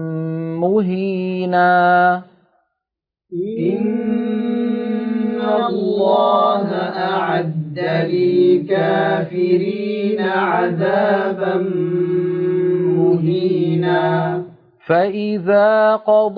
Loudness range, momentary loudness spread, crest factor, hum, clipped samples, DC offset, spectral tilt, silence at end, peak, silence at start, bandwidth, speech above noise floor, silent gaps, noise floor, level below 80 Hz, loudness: 3 LU; 7 LU; 14 dB; none; under 0.1%; under 0.1%; -10 dB/octave; 0 s; -2 dBFS; 0 s; 5 kHz; 68 dB; none; -84 dBFS; -66 dBFS; -17 LUFS